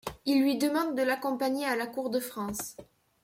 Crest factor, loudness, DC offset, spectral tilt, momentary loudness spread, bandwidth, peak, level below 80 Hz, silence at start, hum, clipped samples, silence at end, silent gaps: 16 dB; -30 LUFS; under 0.1%; -3.5 dB/octave; 9 LU; 16.5 kHz; -14 dBFS; -64 dBFS; 0.05 s; none; under 0.1%; 0.4 s; none